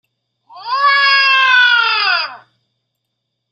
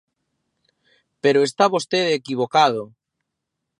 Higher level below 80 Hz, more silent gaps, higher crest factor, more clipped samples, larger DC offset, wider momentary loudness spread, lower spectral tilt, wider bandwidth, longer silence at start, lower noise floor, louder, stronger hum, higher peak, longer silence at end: about the same, -78 dBFS vs -74 dBFS; neither; second, 14 dB vs 20 dB; neither; neither; first, 13 LU vs 6 LU; second, 1.5 dB/octave vs -4 dB/octave; second, 8 kHz vs 11.5 kHz; second, 0.55 s vs 1.25 s; second, -73 dBFS vs -80 dBFS; first, -11 LUFS vs -19 LUFS; neither; about the same, -2 dBFS vs -2 dBFS; first, 1.15 s vs 0.95 s